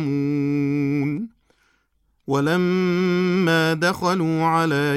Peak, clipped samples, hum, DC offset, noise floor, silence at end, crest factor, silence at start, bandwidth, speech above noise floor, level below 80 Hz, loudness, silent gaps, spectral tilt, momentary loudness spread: -6 dBFS; under 0.1%; none; under 0.1%; -66 dBFS; 0 s; 16 dB; 0 s; 14.5 kHz; 47 dB; -60 dBFS; -21 LUFS; none; -6.5 dB/octave; 7 LU